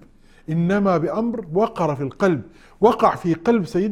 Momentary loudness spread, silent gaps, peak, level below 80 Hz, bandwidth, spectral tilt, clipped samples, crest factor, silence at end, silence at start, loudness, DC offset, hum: 6 LU; none; -2 dBFS; -50 dBFS; 12.5 kHz; -8 dB/octave; under 0.1%; 18 dB; 0 s; 0.5 s; -20 LUFS; under 0.1%; none